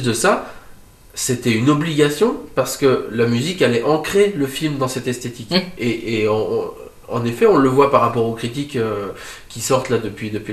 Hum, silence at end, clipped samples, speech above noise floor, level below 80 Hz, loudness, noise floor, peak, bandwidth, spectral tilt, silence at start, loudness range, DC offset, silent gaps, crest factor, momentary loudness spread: none; 0 s; under 0.1%; 24 dB; -46 dBFS; -18 LUFS; -42 dBFS; 0 dBFS; 15 kHz; -5 dB/octave; 0 s; 2 LU; under 0.1%; none; 18 dB; 12 LU